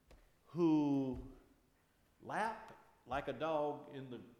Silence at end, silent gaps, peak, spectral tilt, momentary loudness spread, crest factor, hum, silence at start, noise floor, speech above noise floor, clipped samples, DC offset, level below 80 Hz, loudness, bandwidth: 0.05 s; none; -26 dBFS; -7.5 dB/octave; 18 LU; 16 dB; none; 0.1 s; -74 dBFS; 32 dB; under 0.1%; under 0.1%; -64 dBFS; -39 LUFS; 10.5 kHz